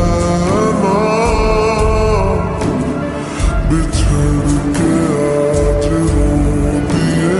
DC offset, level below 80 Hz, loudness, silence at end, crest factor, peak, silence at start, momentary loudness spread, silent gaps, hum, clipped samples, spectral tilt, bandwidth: under 0.1%; -20 dBFS; -14 LUFS; 0 s; 10 dB; -2 dBFS; 0 s; 4 LU; none; none; under 0.1%; -6.5 dB/octave; 11.5 kHz